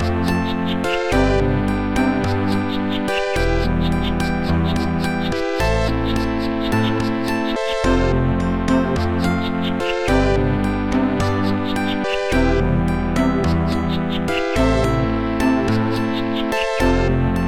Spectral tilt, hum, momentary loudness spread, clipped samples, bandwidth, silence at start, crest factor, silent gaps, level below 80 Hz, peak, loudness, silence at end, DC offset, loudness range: -6.5 dB/octave; none; 4 LU; under 0.1%; 16 kHz; 0 s; 14 dB; none; -28 dBFS; -4 dBFS; -19 LUFS; 0 s; 2%; 1 LU